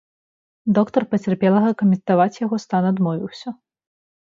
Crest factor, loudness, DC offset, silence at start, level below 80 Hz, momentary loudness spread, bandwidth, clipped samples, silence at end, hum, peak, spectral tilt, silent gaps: 18 dB; -19 LUFS; under 0.1%; 0.65 s; -64 dBFS; 12 LU; 7.4 kHz; under 0.1%; 0.7 s; none; -2 dBFS; -8.5 dB/octave; none